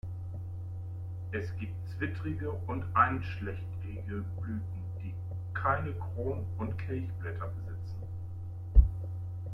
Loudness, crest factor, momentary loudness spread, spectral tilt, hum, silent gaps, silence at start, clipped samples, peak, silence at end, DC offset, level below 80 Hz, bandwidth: -35 LUFS; 24 dB; 14 LU; -9 dB/octave; none; none; 0.05 s; under 0.1%; -8 dBFS; 0 s; under 0.1%; -36 dBFS; 5.6 kHz